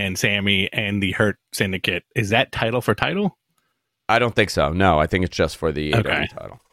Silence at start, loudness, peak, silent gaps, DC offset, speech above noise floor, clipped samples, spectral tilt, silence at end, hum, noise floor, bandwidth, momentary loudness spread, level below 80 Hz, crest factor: 0 s; -20 LUFS; -2 dBFS; none; under 0.1%; 53 dB; under 0.1%; -5 dB/octave; 0.15 s; none; -73 dBFS; 16 kHz; 7 LU; -40 dBFS; 18 dB